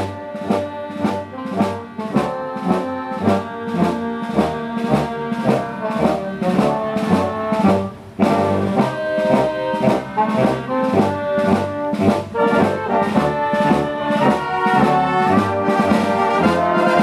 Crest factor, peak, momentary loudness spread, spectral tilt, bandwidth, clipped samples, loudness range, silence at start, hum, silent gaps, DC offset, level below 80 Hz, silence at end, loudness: 16 dB; -2 dBFS; 7 LU; -7 dB/octave; 14 kHz; under 0.1%; 4 LU; 0 s; none; none; under 0.1%; -48 dBFS; 0 s; -18 LUFS